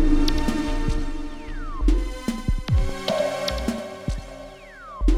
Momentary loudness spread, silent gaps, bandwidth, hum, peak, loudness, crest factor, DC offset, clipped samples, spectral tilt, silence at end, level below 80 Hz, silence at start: 13 LU; none; 13.5 kHz; none; -8 dBFS; -27 LUFS; 16 dB; under 0.1%; under 0.1%; -6 dB/octave; 0 s; -24 dBFS; 0 s